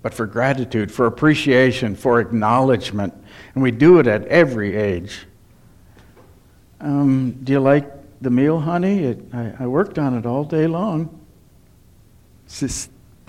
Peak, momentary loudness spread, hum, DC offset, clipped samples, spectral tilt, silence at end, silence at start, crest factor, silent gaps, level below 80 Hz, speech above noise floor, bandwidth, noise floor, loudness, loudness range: -2 dBFS; 14 LU; none; under 0.1%; under 0.1%; -6.5 dB/octave; 0.45 s; 0.05 s; 18 dB; none; -48 dBFS; 32 dB; 13.5 kHz; -50 dBFS; -18 LUFS; 7 LU